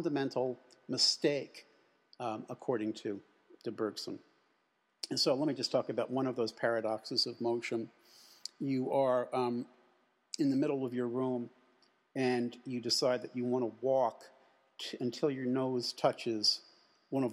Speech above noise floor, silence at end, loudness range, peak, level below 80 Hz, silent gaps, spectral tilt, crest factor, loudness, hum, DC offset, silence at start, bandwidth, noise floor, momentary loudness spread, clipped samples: 43 dB; 0 s; 3 LU; -14 dBFS; -90 dBFS; none; -4.5 dB/octave; 20 dB; -34 LUFS; none; under 0.1%; 0 s; 15 kHz; -77 dBFS; 14 LU; under 0.1%